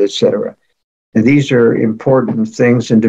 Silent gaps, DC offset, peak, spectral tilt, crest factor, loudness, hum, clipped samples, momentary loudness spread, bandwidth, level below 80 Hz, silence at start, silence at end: 0.84-1.12 s; under 0.1%; 0 dBFS; -7 dB/octave; 12 dB; -12 LUFS; none; under 0.1%; 8 LU; 8.2 kHz; -54 dBFS; 0 s; 0 s